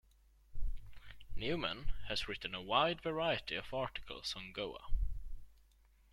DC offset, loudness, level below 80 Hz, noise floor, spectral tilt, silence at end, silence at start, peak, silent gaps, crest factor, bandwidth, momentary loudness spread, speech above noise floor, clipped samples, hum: under 0.1%; -39 LUFS; -44 dBFS; -67 dBFS; -4.5 dB/octave; 0.6 s; 0.5 s; -18 dBFS; none; 20 dB; 12 kHz; 21 LU; 29 dB; under 0.1%; none